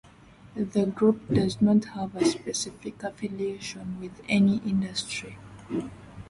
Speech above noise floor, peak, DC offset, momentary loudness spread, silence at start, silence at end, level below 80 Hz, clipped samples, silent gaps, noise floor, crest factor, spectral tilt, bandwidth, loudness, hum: 25 dB; -10 dBFS; under 0.1%; 14 LU; 0.5 s; 0 s; -56 dBFS; under 0.1%; none; -52 dBFS; 18 dB; -5.5 dB/octave; 11.5 kHz; -27 LUFS; none